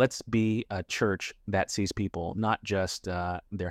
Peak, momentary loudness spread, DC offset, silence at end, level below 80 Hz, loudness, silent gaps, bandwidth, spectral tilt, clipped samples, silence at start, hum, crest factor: -12 dBFS; 6 LU; under 0.1%; 0 s; -54 dBFS; -30 LUFS; none; 15.5 kHz; -5 dB/octave; under 0.1%; 0 s; none; 18 dB